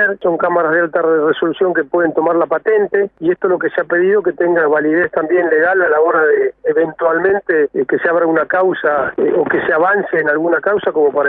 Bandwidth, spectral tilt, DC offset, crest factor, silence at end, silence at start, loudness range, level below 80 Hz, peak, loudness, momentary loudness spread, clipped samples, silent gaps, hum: 3.9 kHz; -9.5 dB/octave; under 0.1%; 12 dB; 0 s; 0 s; 1 LU; -58 dBFS; -2 dBFS; -14 LUFS; 4 LU; under 0.1%; none; none